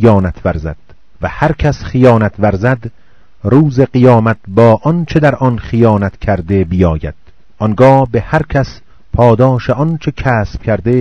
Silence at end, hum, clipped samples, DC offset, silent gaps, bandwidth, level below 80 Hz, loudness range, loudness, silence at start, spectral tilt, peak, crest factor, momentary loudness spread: 0 s; none; 2%; 2%; none; 7.2 kHz; -30 dBFS; 3 LU; -12 LUFS; 0 s; -9 dB/octave; 0 dBFS; 12 dB; 11 LU